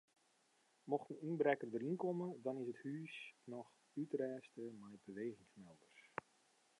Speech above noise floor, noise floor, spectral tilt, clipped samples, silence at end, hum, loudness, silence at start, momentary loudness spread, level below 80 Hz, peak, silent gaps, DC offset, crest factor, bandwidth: 33 dB; -78 dBFS; -7.5 dB/octave; under 0.1%; 0.8 s; none; -45 LUFS; 0.85 s; 19 LU; under -90 dBFS; -22 dBFS; none; under 0.1%; 24 dB; 11 kHz